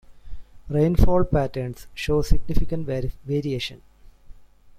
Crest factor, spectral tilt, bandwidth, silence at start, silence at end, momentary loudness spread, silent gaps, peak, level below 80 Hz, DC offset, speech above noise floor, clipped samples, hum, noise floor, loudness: 18 dB; -7 dB/octave; 14.5 kHz; 0.1 s; 0.45 s; 11 LU; none; -2 dBFS; -28 dBFS; under 0.1%; 24 dB; under 0.1%; none; -44 dBFS; -25 LUFS